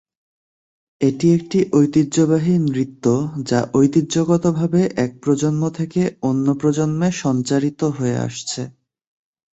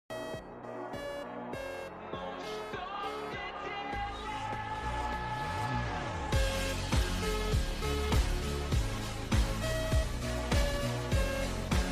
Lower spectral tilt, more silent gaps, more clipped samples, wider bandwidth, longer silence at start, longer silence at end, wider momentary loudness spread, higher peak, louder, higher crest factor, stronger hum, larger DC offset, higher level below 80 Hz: first, -6.5 dB/octave vs -5 dB/octave; neither; neither; second, 8.2 kHz vs 15.5 kHz; first, 1 s vs 0.1 s; first, 0.8 s vs 0 s; second, 6 LU vs 9 LU; first, -2 dBFS vs -18 dBFS; first, -18 LUFS vs -35 LUFS; about the same, 16 dB vs 16 dB; neither; neither; second, -56 dBFS vs -38 dBFS